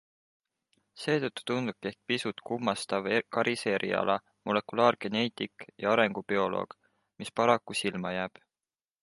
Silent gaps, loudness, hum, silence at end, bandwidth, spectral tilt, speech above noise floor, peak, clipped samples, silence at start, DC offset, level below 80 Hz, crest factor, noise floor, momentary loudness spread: none; -30 LUFS; none; 0.75 s; 11.5 kHz; -4.5 dB/octave; over 60 dB; -8 dBFS; under 0.1%; 0.95 s; under 0.1%; -70 dBFS; 24 dB; under -90 dBFS; 11 LU